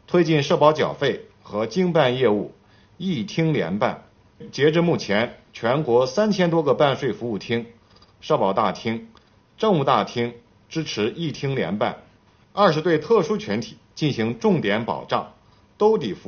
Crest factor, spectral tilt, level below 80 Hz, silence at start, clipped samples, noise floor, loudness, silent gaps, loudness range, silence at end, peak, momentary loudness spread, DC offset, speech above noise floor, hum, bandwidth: 20 dB; -5 dB/octave; -58 dBFS; 0.1 s; under 0.1%; -55 dBFS; -22 LUFS; none; 3 LU; 0.1 s; -2 dBFS; 11 LU; under 0.1%; 34 dB; none; 6.8 kHz